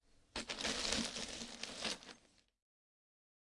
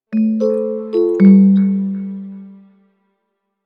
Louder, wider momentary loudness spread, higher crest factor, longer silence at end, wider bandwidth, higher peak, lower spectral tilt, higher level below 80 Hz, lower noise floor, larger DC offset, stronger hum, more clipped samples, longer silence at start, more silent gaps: second, -41 LUFS vs -14 LUFS; second, 12 LU vs 18 LU; first, 28 dB vs 14 dB; first, 1.3 s vs 1.1 s; first, 11.5 kHz vs 4.9 kHz; second, -18 dBFS vs 0 dBFS; second, -1.5 dB/octave vs -11.5 dB/octave; about the same, -64 dBFS vs -62 dBFS; about the same, -69 dBFS vs -72 dBFS; neither; neither; neither; first, 0.35 s vs 0.1 s; neither